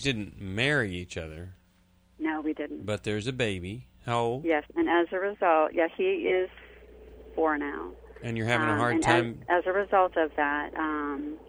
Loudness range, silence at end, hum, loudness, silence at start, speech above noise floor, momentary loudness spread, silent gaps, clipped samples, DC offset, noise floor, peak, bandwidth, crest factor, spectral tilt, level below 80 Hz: 6 LU; 0 s; none; -28 LUFS; 0 s; 35 dB; 14 LU; none; under 0.1%; under 0.1%; -63 dBFS; -8 dBFS; over 20 kHz; 20 dB; -5.5 dB/octave; -54 dBFS